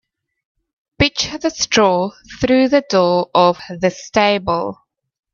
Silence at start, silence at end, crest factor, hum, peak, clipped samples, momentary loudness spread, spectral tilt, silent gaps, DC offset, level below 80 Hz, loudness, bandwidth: 1 s; 0.6 s; 18 dB; none; 0 dBFS; under 0.1%; 7 LU; -4 dB/octave; none; under 0.1%; -44 dBFS; -16 LUFS; 7.4 kHz